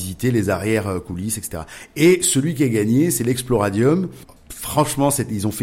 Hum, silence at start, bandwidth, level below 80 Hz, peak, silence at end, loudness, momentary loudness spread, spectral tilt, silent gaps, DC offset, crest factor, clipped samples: none; 0 s; 16.5 kHz; -44 dBFS; -4 dBFS; 0 s; -19 LUFS; 13 LU; -5 dB/octave; none; under 0.1%; 14 dB; under 0.1%